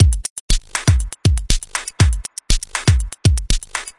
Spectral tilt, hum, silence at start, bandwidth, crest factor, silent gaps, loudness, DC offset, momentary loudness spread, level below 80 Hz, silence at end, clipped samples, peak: -4 dB/octave; none; 0 s; 11.5 kHz; 16 dB; 0.30-0.49 s; -19 LUFS; under 0.1%; 5 LU; -20 dBFS; 0.1 s; under 0.1%; 0 dBFS